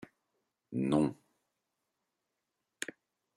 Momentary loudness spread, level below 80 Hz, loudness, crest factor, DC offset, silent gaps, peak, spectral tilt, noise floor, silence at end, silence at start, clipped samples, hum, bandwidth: 13 LU; -70 dBFS; -35 LUFS; 22 dB; under 0.1%; none; -18 dBFS; -6 dB/octave; -86 dBFS; 0.5 s; 0.7 s; under 0.1%; none; 14 kHz